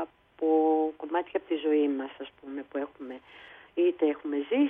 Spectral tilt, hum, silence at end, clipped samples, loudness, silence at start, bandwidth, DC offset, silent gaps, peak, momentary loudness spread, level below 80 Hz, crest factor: -7 dB/octave; none; 0 s; under 0.1%; -29 LUFS; 0 s; 3.8 kHz; under 0.1%; none; -14 dBFS; 18 LU; -74 dBFS; 16 dB